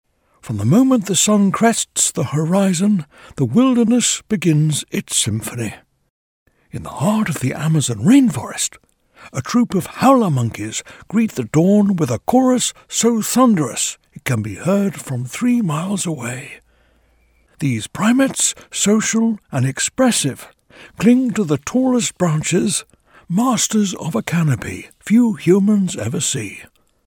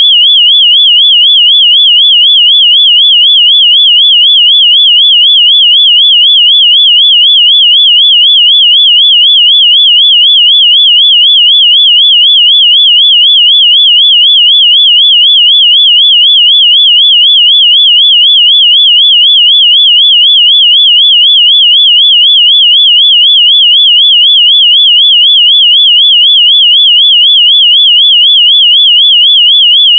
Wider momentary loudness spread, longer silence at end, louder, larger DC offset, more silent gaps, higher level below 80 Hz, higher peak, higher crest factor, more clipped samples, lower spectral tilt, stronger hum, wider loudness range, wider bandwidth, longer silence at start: first, 11 LU vs 0 LU; first, 0.45 s vs 0 s; second, -17 LUFS vs 0 LUFS; neither; first, 6.10-6.46 s vs none; first, -54 dBFS vs under -90 dBFS; about the same, 0 dBFS vs 0 dBFS; first, 16 dB vs 4 dB; second, under 0.1% vs 0.4%; first, -4.5 dB/octave vs 21 dB/octave; neither; first, 5 LU vs 0 LU; first, 18 kHz vs 3.7 kHz; first, 0.45 s vs 0 s